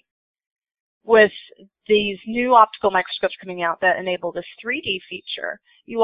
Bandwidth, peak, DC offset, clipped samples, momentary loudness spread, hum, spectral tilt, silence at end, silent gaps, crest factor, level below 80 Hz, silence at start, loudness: 5.2 kHz; 0 dBFS; under 0.1%; under 0.1%; 16 LU; none; -8.5 dB/octave; 0 s; none; 20 dB; -62 dBFS; 1.05 s; -20 LUFS